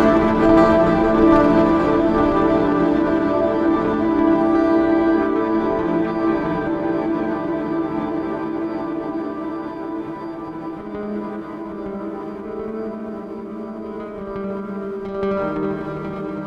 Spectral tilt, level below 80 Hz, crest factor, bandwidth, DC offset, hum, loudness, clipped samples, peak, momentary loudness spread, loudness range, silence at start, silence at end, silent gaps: -8.5 dB/octave; -40 dBFS; 18 dB; 7.2 kHz; under 0.1%; none; -19 LUFS; under 0.1%; -2 dBFS; 15 LU; 13 LU; 0 s; 0 s; none